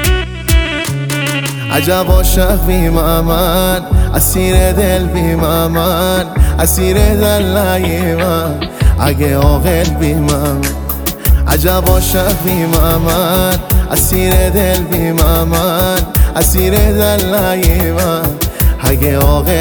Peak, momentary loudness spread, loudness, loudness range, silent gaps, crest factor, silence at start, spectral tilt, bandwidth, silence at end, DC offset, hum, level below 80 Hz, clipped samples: 0 dBFS; 4 LU; -12 LUFS; 1 LU; none; 10 dB; 0 s; -5 dB/octave; over 20 kHz; 0 s; under 0.1%; none; -16 dBFS; under 0.1%